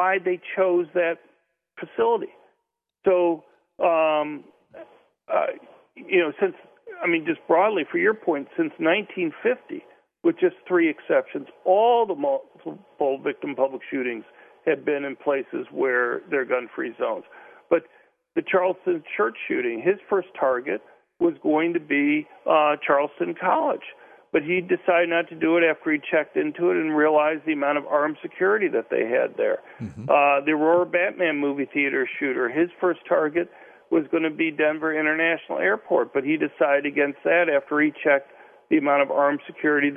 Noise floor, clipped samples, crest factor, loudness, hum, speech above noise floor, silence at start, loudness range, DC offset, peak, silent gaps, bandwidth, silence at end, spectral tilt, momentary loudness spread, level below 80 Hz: -79 dBFS; under 0.1%; 18 dB; -23 LUFS; none; 56 dB; 0 s; 4 LU; under 0.1%; -6 dBFS; none; 3.6 kHz; 0 s; -8.5 dB/octave; 9 LU; -72 dBFS